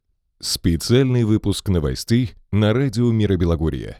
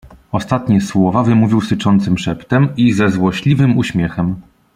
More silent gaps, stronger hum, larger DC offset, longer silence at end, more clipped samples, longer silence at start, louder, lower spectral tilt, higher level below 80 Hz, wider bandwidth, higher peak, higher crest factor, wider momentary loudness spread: neither; neither; neither; second, 0.05 s vs 0.35 s; neither; first, 0.4 s vs 0.05 s; second, -19 LUFS vs -15 LUFS; about the same, -6 dB/octave vs -7 dB/octave; first, -34 dBFS vs -44 dBFS; first, 15.5 kHz vs 11.5 kHz; about the same, -4 dBFS vs -2 dBFS; about the same, 14 dB vs 12 dB; about the same, 5 LU vs 7 LU